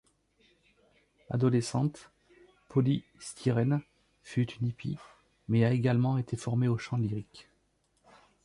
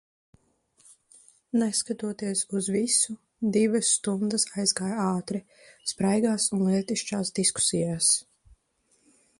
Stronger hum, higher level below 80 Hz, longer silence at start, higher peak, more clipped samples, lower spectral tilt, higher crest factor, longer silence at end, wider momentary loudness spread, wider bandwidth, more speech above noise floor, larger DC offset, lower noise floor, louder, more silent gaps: first, 50 Hz at -60 dBFS vs none; about the same, -62 dBFS vs -66 dBFS; second, 1.3 s vs 1.55 s; second, -14 dBFS vs -8 dBFS; neither; first, -7.5 dB/octave vs -3.5 dB/octave; about the same, 18 dB vs 20 dB; about the same, 1.05 s vs 1.15 s; first, 12 LU vs 9 LU; about the same, 11.5 kHz vs 11.5 kHz; about the same, 43 dB vs 43 dB; neither; first, -73 dBFS vs -69 dBFS; second, -31 LUFS vs -26 LUFS; neither